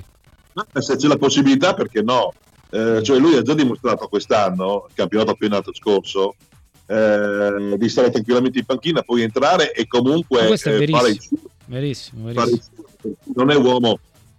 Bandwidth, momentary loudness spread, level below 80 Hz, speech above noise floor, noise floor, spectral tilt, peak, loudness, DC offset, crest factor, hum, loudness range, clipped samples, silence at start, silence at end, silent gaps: 12.5 kHz; 11 LU; -56 dBFS; 35 dB; -52 dBFS; -5.5 dB/octave; -2 dBFS; -18 LUFS; under 0.1%; 14 dB; none; 3 LU; under 0.1%; 0 s; 0.4 s; none